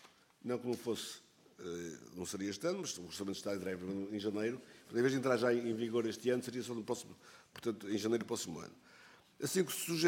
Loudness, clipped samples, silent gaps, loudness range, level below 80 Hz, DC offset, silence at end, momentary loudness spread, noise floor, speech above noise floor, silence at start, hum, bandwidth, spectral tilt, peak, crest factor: -38 LUFS; under 0.1%; none; 5 LU; -78 dBFS; under 0.1%; 0 s; 14 LU; -62 dBFS; 24 dB; 0.05 s; none; 17 kHz; -4.5 dB/octave; -18 dBFS; 22 dB